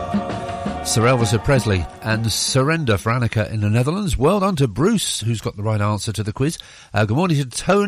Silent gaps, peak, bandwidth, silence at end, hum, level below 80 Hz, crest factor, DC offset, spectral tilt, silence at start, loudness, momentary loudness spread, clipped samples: none; -6 dBFS; 15.5 kHz; 0 s; none; -38 dBFS; 14 dB; under 0.1%; -5 dB/octave; 0 s; -19 LUFS; 7 LU; under 0.1%